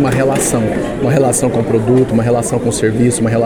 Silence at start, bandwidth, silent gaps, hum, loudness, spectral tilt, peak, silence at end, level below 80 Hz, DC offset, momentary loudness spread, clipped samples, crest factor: 0 s; 19.5 kHz; none; none; -13 LUFS; -6 dB/octave; 0 dBFS; 0 s; -36 dBFS; under 0.1%; 4 LU; under 0.1%; 12 dB